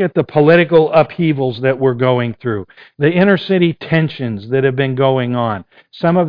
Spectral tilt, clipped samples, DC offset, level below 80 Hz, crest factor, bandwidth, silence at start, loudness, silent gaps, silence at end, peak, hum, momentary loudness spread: -10 dB/octave; under 0.1%; under 0.1%; -52 dBFS; 14 dB; 5.2 kHz; 0 s; -14 LUFS; none; 0 s; 0 dBFS; none; 10 LU